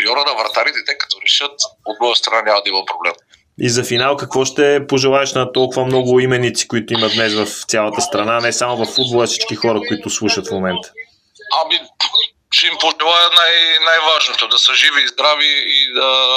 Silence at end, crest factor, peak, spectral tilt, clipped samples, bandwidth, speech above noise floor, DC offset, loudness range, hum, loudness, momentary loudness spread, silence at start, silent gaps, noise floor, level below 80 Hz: 0 s; 16 dB; 0 dBFS; -2.5 dB/octave; under 0.1%; 16 kHz; 23 dB; under 0.1%; 7 LU; none; -13 LUFS; 9 LU; 0 s; none; -38 dBFS; -58 dBFS